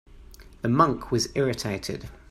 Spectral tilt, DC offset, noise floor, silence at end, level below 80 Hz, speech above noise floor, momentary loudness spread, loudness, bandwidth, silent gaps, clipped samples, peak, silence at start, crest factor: -5.5 dB/octave; under 0.1%; -47 dBFS; 0.15 s; -48 dBFS; 22 dB; 12 LU; -25 LUFS; 16 kHz; none; under 0.1%; -6 dBFS; 0.15 s; 22 dB